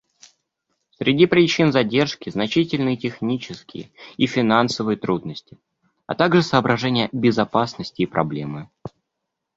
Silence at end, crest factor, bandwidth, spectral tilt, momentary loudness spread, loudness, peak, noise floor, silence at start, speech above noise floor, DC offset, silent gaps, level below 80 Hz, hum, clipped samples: 0.7 s; 20 dB; 7.8 kHz; -6 dB/octave; 19 LU; -20 LUFS; -2 dBFS; -80 dBFS; 1 s; 60 dB; under 0.1%; none; -56 dBFS; none; under 0.1%